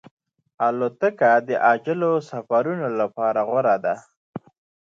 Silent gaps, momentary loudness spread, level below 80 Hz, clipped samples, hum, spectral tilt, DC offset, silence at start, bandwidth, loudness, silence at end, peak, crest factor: 4.17-4.33 s; 14 LU; -74 dBFS; under 0.1%; none; -7.5 dB/octave; under 0.1%; 0.6 s; 7.6 kHz; -21 LUFS; 0.5 s; -6 dBFS; 18 dB